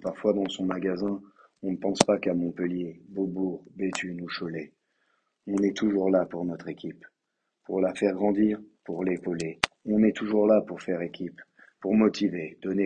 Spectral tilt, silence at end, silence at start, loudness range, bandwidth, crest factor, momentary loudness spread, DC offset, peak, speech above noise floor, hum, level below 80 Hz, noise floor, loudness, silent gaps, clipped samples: -5.5 dB/octave; 0 s; 0 s; 4 LU; 12 kHz; 28 dB; 13 LU; under 0.1%; 0 dBFS; 54 dB; none; -62 dBFS; -81 dBFS; -28 LUFS; none; under 0.1%